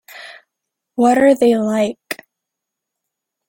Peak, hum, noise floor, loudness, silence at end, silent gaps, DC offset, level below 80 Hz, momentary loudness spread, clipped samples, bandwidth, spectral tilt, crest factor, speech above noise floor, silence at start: -2 dBFS; none; -81 dBFS; -15 LUFS; 1.35 s; none; under 0.1%; -62 dBFS; 19 LU; under 0.1%; 17 kHz; -5 dB/octave; 16 dB; 68 dB; 0.15 s